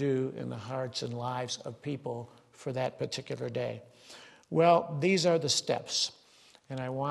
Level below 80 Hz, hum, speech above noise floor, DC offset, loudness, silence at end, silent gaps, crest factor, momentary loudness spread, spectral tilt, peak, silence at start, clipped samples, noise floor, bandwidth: -74 dBFS; none; 29 dB; under 0.1%; -31 LUFS; 0 s; none; 20 dB; 17 LU; -4.5 dB/octave; -12 dBFS; 0 s; under 0.1%; -60 dBFS; 12.5 kHz